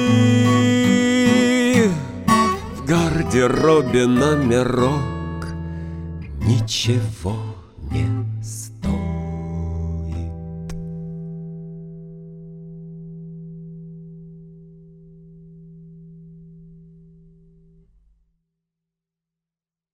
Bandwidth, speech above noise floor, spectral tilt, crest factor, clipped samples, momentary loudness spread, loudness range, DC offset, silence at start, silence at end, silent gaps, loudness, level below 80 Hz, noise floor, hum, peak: 15.5 kHz; over 73 dB; -6 dB/octave; 18 dB; under 0.1%; 22 LU; 22 LU; under 0.1%; 0 s; 3.25 s; none; -19 LUFS; -38 dBFS; under -90 dBFS; none; -2 dBFS